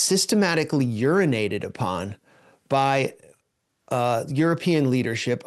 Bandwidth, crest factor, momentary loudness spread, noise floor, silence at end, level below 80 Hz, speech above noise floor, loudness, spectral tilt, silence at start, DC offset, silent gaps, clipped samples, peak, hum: 12.5 kHz; 16 dB; 8 LU; -73 dBFS; 0.05 s; -66 dBFS; 51 dB; -23 LUFS; -5 dB/octave; 0 s; under 0.1%; none; under 0.1%; -6 dBFS; none